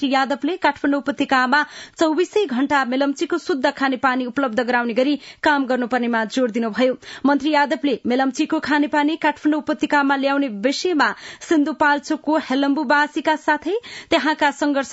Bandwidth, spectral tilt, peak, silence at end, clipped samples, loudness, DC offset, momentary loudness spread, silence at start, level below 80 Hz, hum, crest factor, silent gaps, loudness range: 8 kHz; -3.5 dB/octave; -4 dBFS; 0 s; under 0.1%; -20 LUFS; under 0.1%; 4 LU; 0 s; -62 dBFS; none; 16 dB; none; 1 LU